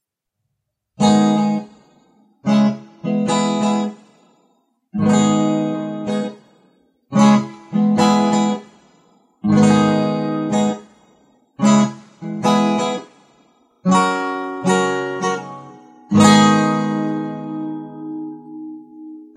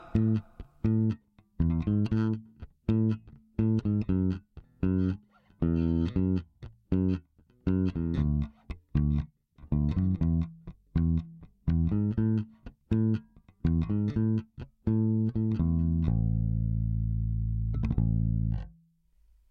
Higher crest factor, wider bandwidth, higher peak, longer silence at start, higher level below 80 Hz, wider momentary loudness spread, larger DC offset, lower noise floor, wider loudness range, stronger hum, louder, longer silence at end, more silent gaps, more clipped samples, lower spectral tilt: about the same, 18 dB vs 16 dB; first, 11 kHz vs 4.9 kHz; first, 0 dBFS vs -12 dBFS; first, 1 s vs 0 s; second, -60 dBFS vs -38 dBFS; first, 17 LU vs 9 LU; neither; first, -77 dBFS vs -65 dBFS; about the same, 4 LU vs 2 LU; neither; first, -17 LUFS vs -30 LUFS; second, 0.1 s vs 0.8 s; neither; neither; second, -5.5 dB/octave vs -11 dB/octave